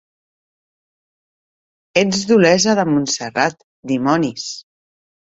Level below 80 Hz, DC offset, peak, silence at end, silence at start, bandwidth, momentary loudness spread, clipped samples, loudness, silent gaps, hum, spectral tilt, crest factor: -58 dBFS; under 0.1%; 0 dBFS; 0.7 s; 1.95 s; 8 kHz; 15 LU; under 0.1%; -16 LUFS; 3.64-3.83 s; none; -4 dB/octave; 18 dB